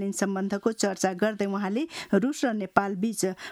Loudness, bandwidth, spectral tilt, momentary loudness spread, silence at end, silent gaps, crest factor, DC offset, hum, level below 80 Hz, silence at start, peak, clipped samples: -27 LUFS; 15 kHz; -5 dB/octave; 4 LU; 0 s; none; 24 dB; under 0.1%; none; -68 dBFS; 0 s; -4 dBFS; under 0.1%